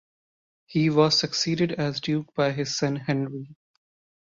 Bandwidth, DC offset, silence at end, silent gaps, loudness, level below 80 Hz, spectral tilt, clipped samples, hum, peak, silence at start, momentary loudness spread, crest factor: 7.6 kHz; under 0.1%; 0.8 s; none; -25 LUFS; -64 dBFS; -5 dB/octave; under 0.1%; none; -6 dBFS; 0.7 s; 8 LU; 20 dB